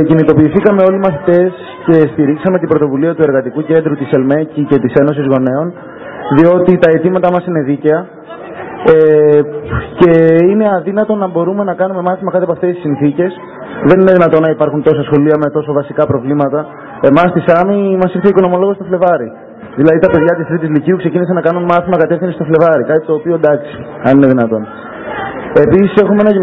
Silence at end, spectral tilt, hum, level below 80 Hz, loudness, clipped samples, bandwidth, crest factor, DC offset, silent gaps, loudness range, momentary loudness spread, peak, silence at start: 0 s; -10.5 dB/octave; none; -42 dBFS; -11 LUFS; 0.6%; 4.8 kHz; 10 dB; under 0.1%; none; 2 LU; 10 LU; 0 dBFS; 0 s